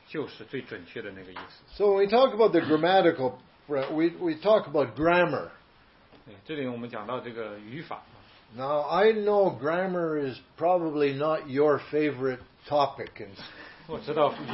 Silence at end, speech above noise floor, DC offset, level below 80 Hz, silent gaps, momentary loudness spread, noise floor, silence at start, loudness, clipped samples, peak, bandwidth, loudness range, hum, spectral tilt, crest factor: 0 s; 31 dB; under 0.1%; -62 dBFS; none; 18 LU; -58 dBFS; 0.1 s; -26 LUFS; under 0.1%; -8 dBFS; 5.8 kHz; 6 LU; none; -10 dB/octave; 18 dB